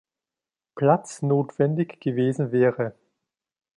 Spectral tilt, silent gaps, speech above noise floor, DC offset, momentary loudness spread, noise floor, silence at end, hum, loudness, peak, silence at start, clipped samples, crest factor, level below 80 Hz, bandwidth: -8 dB/octave; none; over 67 dB; under 0.1%; 5 LU; under -90 dBFS; 0.85 s; none; -24 LUFS; -6 dBFS; 0.75 s; under 0.1%; 20 dB; -70 dBFS; 11 kHz